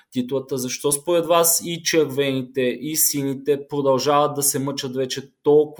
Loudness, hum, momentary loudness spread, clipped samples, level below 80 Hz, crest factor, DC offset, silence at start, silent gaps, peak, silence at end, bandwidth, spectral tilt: -20 LUFS; none; 8 LU; under 0.1%; -66 dBFS; 18 dB; under 0.1%; 0.15 s; none; -4 dBFS; 0.05 s; 19.5 kHz; -3.5 dB/octave